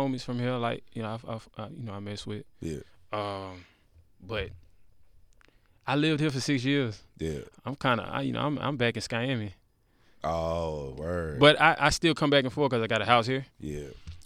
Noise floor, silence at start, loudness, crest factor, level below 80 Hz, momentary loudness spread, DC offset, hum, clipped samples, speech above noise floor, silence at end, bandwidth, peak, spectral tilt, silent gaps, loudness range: -65 dBFS; 0 s; -28 LUFS; 24 dB; -52 dBFS; 16 LU; under 0.1%; none; under 0.1%; 37 dB; 0.05 s; 15 kHz; -4 dBFS; -5 dB/octave; none; 14 LU